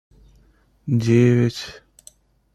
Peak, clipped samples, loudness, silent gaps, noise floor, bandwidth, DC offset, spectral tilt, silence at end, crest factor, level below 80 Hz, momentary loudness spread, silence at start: -4 dBFS; under 0.1%; -18 LUFS; none; -57 dBFS; 12 kHz; under 0.1%; -7.5 dB/octave; 0.85 s; 18 dB; -52 dBFS; 20 LU; 0.85 s